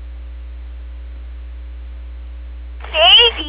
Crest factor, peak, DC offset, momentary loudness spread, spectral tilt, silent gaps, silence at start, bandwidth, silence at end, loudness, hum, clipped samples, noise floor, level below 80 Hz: 18 dB; 0 dBFS; under 0.1%; 26 LU; -7 dB/octave; none; 0 s; 4 kHz; 0 s; -8 LUFS; none; under 0.1%; -30 dBFS; -30 dBFS